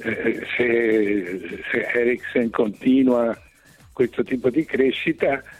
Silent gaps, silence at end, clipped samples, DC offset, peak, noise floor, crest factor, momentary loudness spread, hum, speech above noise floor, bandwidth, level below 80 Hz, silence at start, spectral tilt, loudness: none; 0 s; under 0.1%; under 0.1%; -8 dBFS; -51 dBFS; 14 dB; 7 LU; none; 30 dB; 12 kHz; -56 dBFS; 0 s; -6.5 dB/octave; -21 LUFS